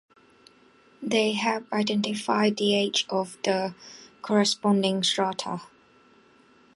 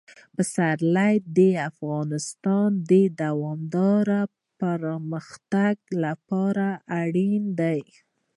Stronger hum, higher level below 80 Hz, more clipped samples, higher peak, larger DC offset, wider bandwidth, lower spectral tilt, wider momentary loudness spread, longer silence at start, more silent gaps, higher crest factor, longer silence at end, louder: neither; about the same, -72 dBFS vs -74 dBFS; neither; about the same, -8 dBFS vs -8 dBFS; neither; about the same, 11.5 kHz vs 11.5 kHz; second, -4 dB/octave vs -7 dB/octave; first, 13 LU vs 9 LU; first, 1 s vs 0.4 s; neither; about the same, 18 dB vs 16 dB; first, 1.1 s vs 0.55 s; about the same, -25 LUFS vs -24 LUFS